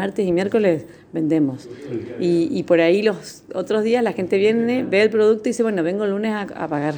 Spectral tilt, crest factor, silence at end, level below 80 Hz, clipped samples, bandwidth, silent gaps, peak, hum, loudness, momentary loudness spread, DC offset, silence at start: -6.5 dB/octave; 16 dB; 0 s; -62 dBFS; under 0.1%; 20 kHz; none; -4 dBFS; none; -19 LUFS; 13 LU; under 0.1%; 0 s